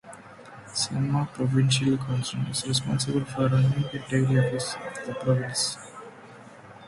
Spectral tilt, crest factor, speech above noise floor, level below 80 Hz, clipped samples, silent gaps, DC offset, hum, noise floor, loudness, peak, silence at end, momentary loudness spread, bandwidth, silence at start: -5 dB/octave; 16 dB; 22 dB; -58 dBFS; under 0.1%; none; under 0.1%; none; -47 dBFS; -26 LUFS; -10 dBFS; 0 s; 22 LU; 11.5 kHz; 0.05 s